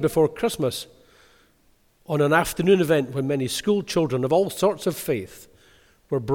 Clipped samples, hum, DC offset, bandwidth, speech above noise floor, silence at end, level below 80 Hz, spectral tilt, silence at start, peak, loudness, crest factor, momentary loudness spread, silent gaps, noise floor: under 0.1%; none; under 0.1%; 19 kHz; 39 dB; 0 s; -52 dBFS; -5.5 dB/octave; 0 s; -4 dBFS; -23 LUFS; 20 dB; 9 LU; none; -61 dBFS